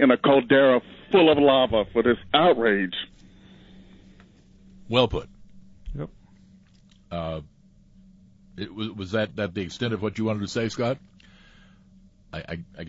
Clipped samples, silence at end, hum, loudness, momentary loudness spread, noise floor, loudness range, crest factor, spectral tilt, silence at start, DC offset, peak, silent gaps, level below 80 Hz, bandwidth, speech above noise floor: under 0.1%; 0 s; none; -23 LUFS; 19 LU; -55 dBFS; 17 LU; 20 dB; -6 dB/octave; 0 s; under 0.1%; -6 dBFS; none; -48 dBFS; 7.8 kHz; 33 dB